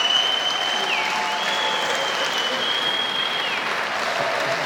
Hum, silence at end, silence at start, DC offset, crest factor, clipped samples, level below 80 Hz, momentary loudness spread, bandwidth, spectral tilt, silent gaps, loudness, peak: none; 0 s; 0 s; under 0.1%; 16 dB; under 0.1%; -72 dBFS; 3 LU; 17 kHz; -0.5 dB/octave; none; -21 LUFS; -8 dBFS